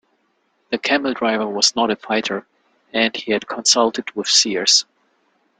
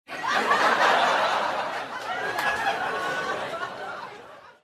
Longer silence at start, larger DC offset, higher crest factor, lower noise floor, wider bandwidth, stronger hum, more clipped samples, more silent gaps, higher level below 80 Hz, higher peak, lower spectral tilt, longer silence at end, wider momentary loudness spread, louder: first, 0.7 s vs 0.1 s; neither; about the same, 20 dB vs 18 dB; first, -66 dBFS vs -46 dBFS; second, 11.5 kHz vs 15.5 kHz; neither; neither; neither; about the same, -66 dBFS vs -66 dBFS; first, 0 dBFS vs -8 dBFS; about the same, -1 dB/octave vs -2 dB/octave; first, 0.75 s vs 0.15 s; second, 11 LU vs 15 LU; first, -17 LUFS vs -24 LUFS